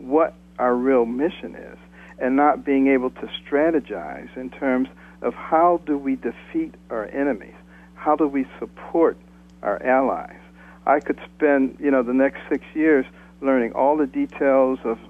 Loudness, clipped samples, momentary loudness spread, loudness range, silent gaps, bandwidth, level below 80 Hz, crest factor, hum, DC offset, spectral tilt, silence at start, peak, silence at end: -22 LUFS; under 0.1%; 13 LU; 4 LU; none; 3.8 kHz; -52 dBFS; 16 dB; none; under 0.1%; -7.5 dB/octave; 0 s; -6 dBFS; 0.05 s